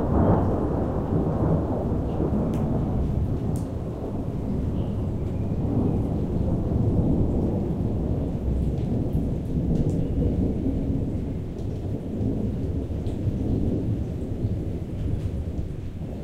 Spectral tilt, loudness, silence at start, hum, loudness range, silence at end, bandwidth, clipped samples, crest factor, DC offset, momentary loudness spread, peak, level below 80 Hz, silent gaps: -10 dB/octave; -26 LUFS; 0 s; none; 3 LU; 0 s; 9.6 kHz; under 0.1%; 16 dB; under 0.1%; 7 LU; -8 dBFS; -32 dBFS; none